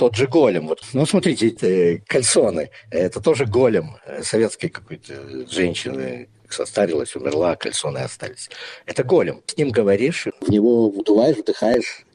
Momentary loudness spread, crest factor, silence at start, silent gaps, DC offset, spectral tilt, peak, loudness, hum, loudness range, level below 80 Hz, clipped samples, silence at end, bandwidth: 15 LU; 16 dB; 0 s; none; under 0.1%; -5 dB/octave; -4 dBFS; -19 LUFS; none; 6 LU; -56 dBFS; under 0.1%; 0.15 s; 11 kHz